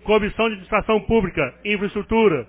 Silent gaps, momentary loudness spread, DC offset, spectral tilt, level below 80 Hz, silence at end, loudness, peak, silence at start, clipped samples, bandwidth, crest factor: none; 5 LU; under 0.1%; -10 dB/octave; -38 dBFS; 0.05 s; -21 LUFS; -4 dBFS; 0.05 s; under 0.1%; 4 kHz; 16 dB